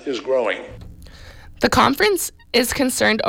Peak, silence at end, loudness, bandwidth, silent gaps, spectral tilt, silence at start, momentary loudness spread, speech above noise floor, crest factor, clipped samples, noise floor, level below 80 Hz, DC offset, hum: -4 dBFS; 0 s; -19 LUFS; 17 kHz; none; -3 dB/octave; 0 s; 9 LU; 21 dB; 16 dB; under 0.1%; -40 dBFS; -42 dBFS; under 0.1%; none